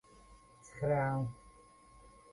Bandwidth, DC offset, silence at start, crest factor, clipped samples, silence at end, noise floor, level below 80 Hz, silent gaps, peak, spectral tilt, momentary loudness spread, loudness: 11.5 kHz; under 0.1%; 0.3 s; 18 dB; under 0.1%; 0.25 s; -61 dBFS; -62 dBFS; none; -22 dBFS; -8 dB/octave; 24 LU; -36 LUFS